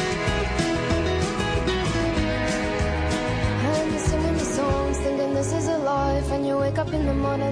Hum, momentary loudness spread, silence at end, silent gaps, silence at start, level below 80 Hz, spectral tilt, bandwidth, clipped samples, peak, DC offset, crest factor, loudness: none; 1 LU; 0 s; none; 0 s; -32 dBFS; -5.5 dB/octave; 13 kHz; under 0.1%; -10 dBFS; under 0.1%; 14 dB; -24 LUFS